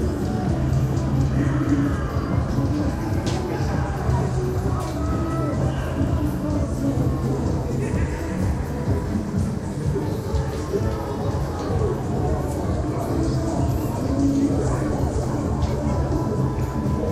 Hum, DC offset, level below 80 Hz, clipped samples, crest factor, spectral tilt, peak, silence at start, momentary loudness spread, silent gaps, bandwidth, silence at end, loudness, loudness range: none; under 0.1%; -30 dBFS; under 0.1%; 14 dB; -7.5 dB/octave; -8 dBFS; 0 s; 4 LU; none; 14.5 kHz; 0 s; -24 LUFS; 2 LU